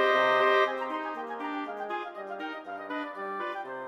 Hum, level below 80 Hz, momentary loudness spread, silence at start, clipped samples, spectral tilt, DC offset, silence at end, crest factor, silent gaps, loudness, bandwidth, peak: none; -82 dBFS; 14 LU; 0 s; under 0.1%; -3.5 dB/octave; under 0.1%; 0 s; 18 dB; none; -30 LUFS; 14 kHz; -12 dBFS